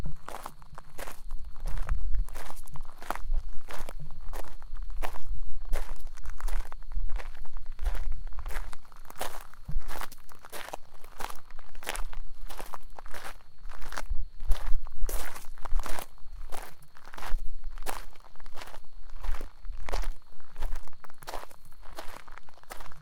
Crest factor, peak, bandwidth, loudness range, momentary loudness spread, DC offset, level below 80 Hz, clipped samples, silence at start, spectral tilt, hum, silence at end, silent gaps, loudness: 16 dB; -6 dBFS; 15.5 kHz; 4 LU; 12 LU; under 0.1%; -34 dBFS; under 0.1%; 0 s; -4 dB/octave; none; 0 s; none; -42 LUFS